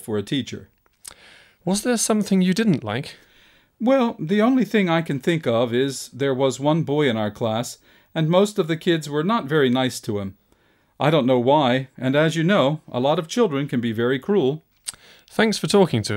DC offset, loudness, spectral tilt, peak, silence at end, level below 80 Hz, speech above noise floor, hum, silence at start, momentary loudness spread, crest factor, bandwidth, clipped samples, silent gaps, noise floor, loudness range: under 0.1%; -21 LUFS; -5.5 dB/octave; -4 dBFS; 0 s; -62 dBFS; 40 dB; none; 0.05 s; 12 LU; 16 dB; 16 kHz; under 0.1%; none; -61 dBFS; 2 LU